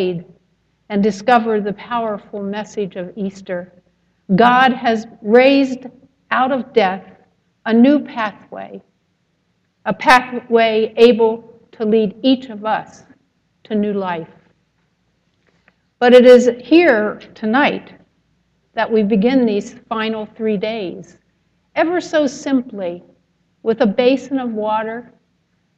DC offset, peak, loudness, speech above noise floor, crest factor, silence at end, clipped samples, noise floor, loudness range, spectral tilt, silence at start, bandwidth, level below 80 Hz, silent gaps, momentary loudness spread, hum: under 0.1%; 0 dBFS; -16 LUFS; 49 dB; 16 dB; 0.75 s; under 0.1%; -65 dBFS; 8 LU; -6 dB/octave; 0 s; 10.5 kHz; -58 dBFS; none; 16 LU; none